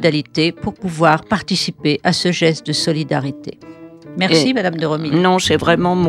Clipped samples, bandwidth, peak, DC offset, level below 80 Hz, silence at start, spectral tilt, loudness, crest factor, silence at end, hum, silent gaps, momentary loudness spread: under 0.1%; 14 kHz; 0 dBFS; under 0.1%; -48 dBFS; 0 s; -5 dB/octave; -16 LUFS; 16 dB; 0 s; none; none; 9 LU